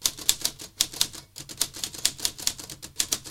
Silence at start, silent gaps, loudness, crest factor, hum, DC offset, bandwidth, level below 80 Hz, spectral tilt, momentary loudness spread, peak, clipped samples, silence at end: 0 s; none; -27 LUFS; 30 dB; none; under 0.1%; 17 kHz; -54 dBFS; 0.5 dB/octave; 14 LU; 0 dBFS; under 0.1%; 0 s